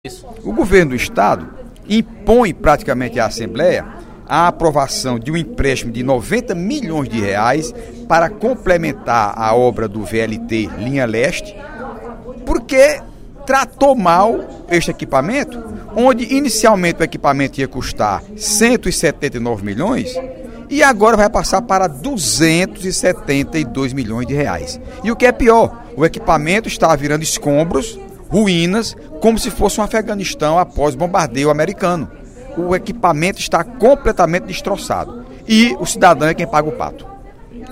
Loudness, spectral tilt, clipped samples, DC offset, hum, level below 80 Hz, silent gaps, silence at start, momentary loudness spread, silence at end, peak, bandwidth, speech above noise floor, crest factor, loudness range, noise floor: -15 LUFS; -4.5 dB/octave; under 0.1%; under 0.1%; none; -32 dBFS; none; 0.05 s; 12 LU; 0 s; 0 dBFS; 16 kHz; 20 dB; 16 dB; 3 LU; -34 dBFS